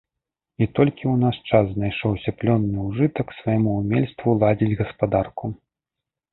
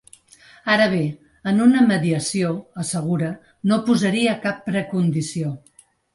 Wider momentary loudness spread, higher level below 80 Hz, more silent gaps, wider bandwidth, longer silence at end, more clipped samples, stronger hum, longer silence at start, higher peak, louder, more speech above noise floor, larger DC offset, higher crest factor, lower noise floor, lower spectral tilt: second, 6 LU vs 11 LU; first, -46 dBFS vs -58 dBFS; neither; second, 4.1 kHz vs 11.5 kHz; first, 0.75 s vs 0.55 s; neither; neither; about the same, 0.6 s vs 0.65 s; about the same, -2 dBFS vs -4 dBFS; about the same, -22 LUFS vs -21 LUFS; first, 65 dB vs 31 dB; neither; about the same, 20 dB vs 16 dB; first, -86 dBFS vs -50 dBFS; first, -12.5 dB/octave vs -5.5 dB/octave